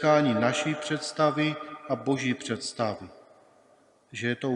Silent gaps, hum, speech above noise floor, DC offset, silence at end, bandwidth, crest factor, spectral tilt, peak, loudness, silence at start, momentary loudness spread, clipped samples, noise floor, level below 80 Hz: none; none; 34 dB; under 0.1%; 0 s; 11 kHz; 20 dB; -5 dB/octave; -8 dBFS; -28 LUFS; 0 s; 12 LU; under 0.1%; -61 dBFS; -74 dBFS